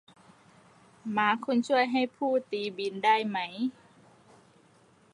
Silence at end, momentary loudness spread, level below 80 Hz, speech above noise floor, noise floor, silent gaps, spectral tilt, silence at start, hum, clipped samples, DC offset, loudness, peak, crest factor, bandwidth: 1.45 s; 9 LU; -80 dBFS; 33 dB; -61 dBFS; none; -5 dB/octave; 1.05 s; none; under 0.1%; under 0.1%; -28 LUFS; -10 dBFS; 20 dB; 11 kHz